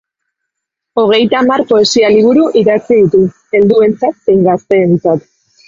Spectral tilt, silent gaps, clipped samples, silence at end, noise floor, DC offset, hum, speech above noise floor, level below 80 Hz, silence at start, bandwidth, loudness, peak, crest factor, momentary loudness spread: -5.5 dB/octave; none; under 0.1%; 0.5 s; -77 dBFS; under 0.1%; none; 68 dB; -50 dBFS; 0.95 s; 7.6 kHz; -10 LUFS; 0 dBFS; 10 dB; 6 LU